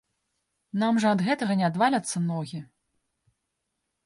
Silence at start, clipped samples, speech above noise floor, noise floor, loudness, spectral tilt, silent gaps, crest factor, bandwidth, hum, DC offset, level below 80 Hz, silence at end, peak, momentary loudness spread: 0.75 s; under 0.1%; 56 dB; -81 dBFS; -25 LUFS; -5.5 dB/octave; none; 16 dB; 11.5 kHz; none; under 0.1%; -72 dBFS; 1.4 s; -12 dBFS; 11 LU